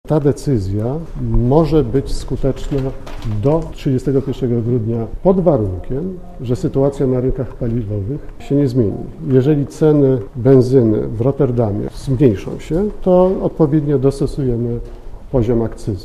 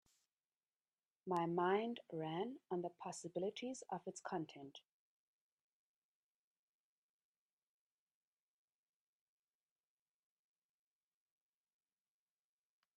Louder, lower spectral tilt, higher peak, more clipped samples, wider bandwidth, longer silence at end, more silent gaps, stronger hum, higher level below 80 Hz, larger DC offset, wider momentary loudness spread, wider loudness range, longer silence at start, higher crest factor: first, -17 LUFS vs -44 LUFS; first, -9 dB/octave vs -5.5 dB/octave; first, 0 dBFS vs -26 dBFS; neither; first, 12.5 kHz vs 10.5 kHz; second, 0 s vs 8.15 s; neither; neither; first, -30 dBFS vs under -90 dBFS; neither; second, 10 LU vs 15 LU; second, 4 LU vs 12 LU; second, 0.05 s vs 1.25 s; second, 16 dB vs 24 dB